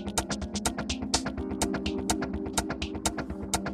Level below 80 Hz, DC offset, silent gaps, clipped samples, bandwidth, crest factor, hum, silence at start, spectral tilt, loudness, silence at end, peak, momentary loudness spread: -42 dBFS; under 0.1%; none; under 0.1%; 16 kHz; 22 dB; none; 0 s; -3.5 dB/octave; -31 LUFS; 0 s; -10 dBFS; 4 LU